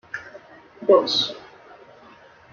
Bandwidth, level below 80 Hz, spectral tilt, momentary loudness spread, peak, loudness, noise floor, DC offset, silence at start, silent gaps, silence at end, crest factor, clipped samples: 7.4 kHz; -68 dBFS; -3.5 dB/octave; 23 LU; -2 dBFS; -20 LUFS; -49 dBFS; under 0.1%; 0.15 s; none; 1.15 s; 22 dB; under 0.1%